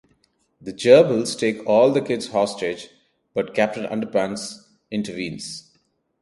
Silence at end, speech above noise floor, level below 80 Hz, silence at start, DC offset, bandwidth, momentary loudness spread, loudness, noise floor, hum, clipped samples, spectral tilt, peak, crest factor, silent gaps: 0.6 s; 46 dB; -64 dBFS; 0.6 s; under 0.1%; 11.5 kHz; 20 LU; -21 LUFS; -67 dBFS; none; under 0.1%; -5 dB/octave; 0 dBFS; 22 dB; none